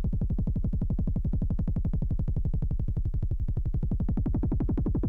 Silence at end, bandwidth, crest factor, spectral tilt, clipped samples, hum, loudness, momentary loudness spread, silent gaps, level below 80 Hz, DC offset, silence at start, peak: 0 s; 2.2 kHz; 8 dB; -12 dB/octave; under 0.1%; none; -31 LUFS; 2 LU; none; -30 dBFS; under 0.1%; 0 s; -18 dBFS